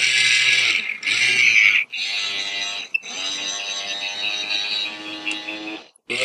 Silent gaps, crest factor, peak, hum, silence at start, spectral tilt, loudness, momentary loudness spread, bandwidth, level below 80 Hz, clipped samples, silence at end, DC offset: none; 20 dB; 0 dBFS; none; 0 s; 1 dB/octave; -18 LUFS; 14 LU; 13.5 kHz; -76 dBFS; under 0.1%; 0 s; under 0.1%